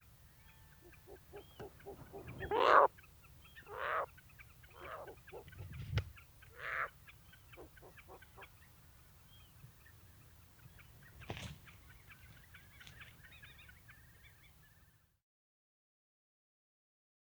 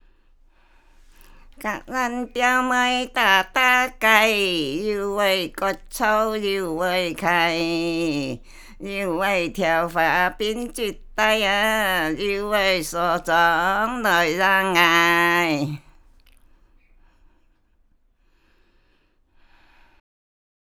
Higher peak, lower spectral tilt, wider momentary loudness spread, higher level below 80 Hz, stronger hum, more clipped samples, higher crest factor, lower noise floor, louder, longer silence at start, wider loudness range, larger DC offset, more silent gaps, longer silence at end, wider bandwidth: second, -12 dBFS vs 0 dBFS; first, -5 dB/octave vs -3.5 dB/octave; first, 21 LU vs 11 LU; second, -62 dBFS vs -46 dBFS; neither; neither; first, 30 dB vs 22 dB; first, -69 dBFS vs -62 dBFS; second, -37 LUFS vs -20 LUFS; second, 0.85 s vs 1.6 s; first, 23 LU vs 5 LU; neither; neither; second, 2.95 s vs 5 s; about the same, over 20 kHz vs over 20 kHz